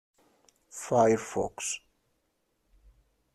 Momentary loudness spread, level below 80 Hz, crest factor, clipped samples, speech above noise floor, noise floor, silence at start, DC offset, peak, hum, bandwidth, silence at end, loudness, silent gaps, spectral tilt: 17 LU; -64 dBFS; 20 dB; under 0.1%; 48 dB; -76 dBFS; 0.75 s; under 0.1%; -12 dBFS; none; 13 kHz; 1.55 s; -28 LUFS; none; -4.5 dB/octave